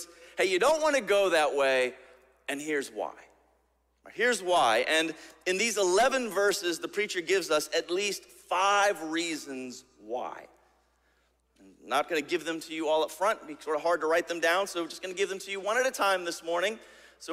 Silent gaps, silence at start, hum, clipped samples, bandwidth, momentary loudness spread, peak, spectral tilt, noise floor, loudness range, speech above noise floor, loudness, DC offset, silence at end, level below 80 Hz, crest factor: none; 0 s; none; under 0.1%; 16 kHz; 13 LU; -12 dBFS; -2 dB/octave; -71 dBFS; 6 LU; 43 dB; -28 LUFS; under 0.1%; 0 s; -70 dBFS; 18 dB